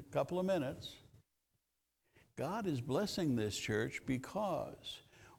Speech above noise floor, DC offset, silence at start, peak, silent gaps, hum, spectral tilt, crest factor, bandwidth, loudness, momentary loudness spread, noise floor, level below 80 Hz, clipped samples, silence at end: 47 dB; under 0.1%; 0 s; -22 dBFS; none; none; -5.5 dB/octave; 18 dB; 18.5 kHz; -39 LUFS; 13 LU; -85 dBFS; -66 dBFS; under 0.1%; 0.05 s